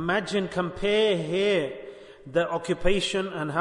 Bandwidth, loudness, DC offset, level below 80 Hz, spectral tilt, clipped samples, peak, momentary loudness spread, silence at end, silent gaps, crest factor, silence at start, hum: 11 kHz; -26 LUFS; under 0.1%; -42 dBFS; -5 dB/octave; under 0.1%; -10 dBFS; 10 LU; 0 s; none; 16 dB; 0 s; none